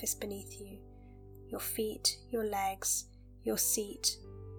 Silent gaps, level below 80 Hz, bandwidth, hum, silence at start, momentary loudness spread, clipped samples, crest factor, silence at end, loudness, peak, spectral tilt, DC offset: none; -56 dBFS; 19 kHz; none; 0 s; 20 LU; under 0.1%; 22 dB; 0 s; -34 LUFS; -16 dBFS; -2 dB/octave; under 0.1%